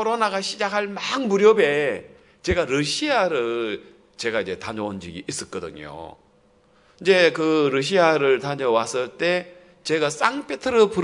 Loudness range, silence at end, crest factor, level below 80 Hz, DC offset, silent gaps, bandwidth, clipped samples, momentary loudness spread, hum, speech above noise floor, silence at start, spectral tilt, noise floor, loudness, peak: 8 LU; 0 s; 20 dB; -50 dBFS; under 0.1%; none; 11 kHz; under 0.1%; 16 LU; none; 36 dB; 0 s; -4 dB/octave; -58 dBFS; -21 LUFS; -2 dBFS